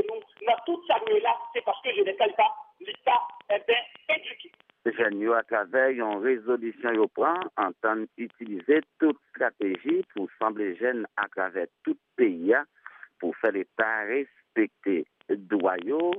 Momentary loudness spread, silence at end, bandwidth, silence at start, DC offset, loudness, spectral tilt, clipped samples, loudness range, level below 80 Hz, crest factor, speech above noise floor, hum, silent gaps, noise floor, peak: 9 LU; 0 s; 3.9 kHz; 0 s; under 0.1%; -27 LUFS; -7 dB/octave; under 0.1%; 2 LU; -88 dBFS; 18 dB; 24 dB; none; none; -51 dBFS; -10 dBFS